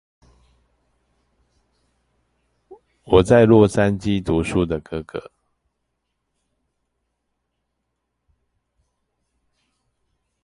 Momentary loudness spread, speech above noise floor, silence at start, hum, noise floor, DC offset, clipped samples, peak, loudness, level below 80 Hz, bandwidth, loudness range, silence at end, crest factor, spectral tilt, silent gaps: 17 LU; 59 dB; 2.7 s; none; -76 dBFS; under 0.1%; under 0.1%; 0 dBFS; -17 LUFS; -44 dBFS; 11.5 kHz; 11 LU; 5.25 s; 22 dB; -7 dB/octave; none